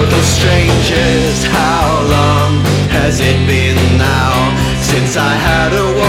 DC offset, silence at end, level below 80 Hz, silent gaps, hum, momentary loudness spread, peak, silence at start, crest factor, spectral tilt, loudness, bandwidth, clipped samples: under 0.1%; 0 s; -22 dBFS; none; none; 2 LU; 0 dBFS; 0 s; 10 dB; -5 dB/octave; -11 LUFS; 16 kHz; under 0.1%